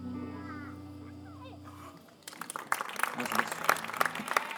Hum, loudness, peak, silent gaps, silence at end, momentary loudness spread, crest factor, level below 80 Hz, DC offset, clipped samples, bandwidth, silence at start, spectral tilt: none; -33 LUFS; -8 dBFS; none; 0 s; 18 LU; 28 dB; -74 dBFS; under 0.1%; under 0.1%; over 20 kHz; 0 s; -3 dB/octave